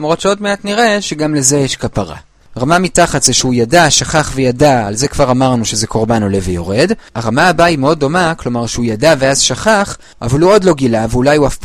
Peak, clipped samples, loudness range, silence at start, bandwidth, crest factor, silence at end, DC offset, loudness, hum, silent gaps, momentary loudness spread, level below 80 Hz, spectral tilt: 0 dBFS; under 0.1%; 2 LU; 0 s; over 20 kHz; 12 dB; 0 s; under 0.1%; -12 LUFS; none; none; 8 LU; -32 dBFS; -4 dB/octave